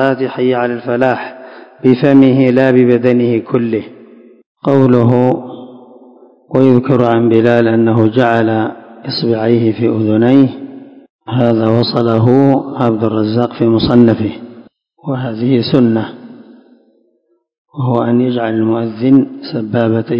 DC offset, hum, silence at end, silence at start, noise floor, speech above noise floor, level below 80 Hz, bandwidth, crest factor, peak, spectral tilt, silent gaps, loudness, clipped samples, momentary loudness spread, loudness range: under 0.1%; none; 0 s; 0 s; -60 dBFS; 49 dB; -48 dBFS; 5.6 kHz; 12 dB; 0 dBFS; -9.5 dB/octave; 4.46-4.55 s, 11.10-11.19 s, 17.58-17.65 s; -12 LUFS; 0.9%; 12 LU; 5 LU